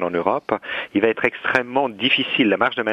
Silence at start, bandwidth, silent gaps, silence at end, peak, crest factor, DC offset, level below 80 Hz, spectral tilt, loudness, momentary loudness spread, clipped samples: 0 s; 9.2 kHz; none; 0 s; 0 dBFS; 20 dB; under 0.1%; -62 dBFS; -5.5 dB/octave; -20 LUFS; 6 LU; under 0.1%